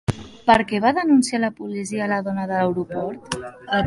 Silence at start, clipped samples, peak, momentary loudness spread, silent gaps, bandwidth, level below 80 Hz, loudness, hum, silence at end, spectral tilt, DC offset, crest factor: 0.1 s; under 0.1%; -2 dBFS; 12 LU; none; 11.5 kHz; -50 dBFS; -21 LUFS; none; 0 s; -5.5 dB/octave; under 0.1%; 18 dB